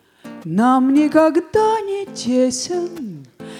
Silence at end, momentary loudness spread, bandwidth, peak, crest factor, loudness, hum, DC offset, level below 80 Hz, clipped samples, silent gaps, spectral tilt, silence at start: 0 s; 18 LU; 13.5 kHz; -2 dBFS; 16 dB; -17 LUFS; none; under 0.1%; -58 dBFS; under 0.1%; none; -5 dB/octave; 0.25 s